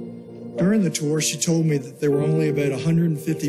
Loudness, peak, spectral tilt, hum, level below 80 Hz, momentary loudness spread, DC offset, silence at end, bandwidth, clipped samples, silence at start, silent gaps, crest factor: -21 LUFS; -10 dBFS; -5.5 dB/octave; none; -62 dBFS; 4 LU; under 0.1%; 0 s; 14 kHz; under 0.1%; 0 s; none; 12 dB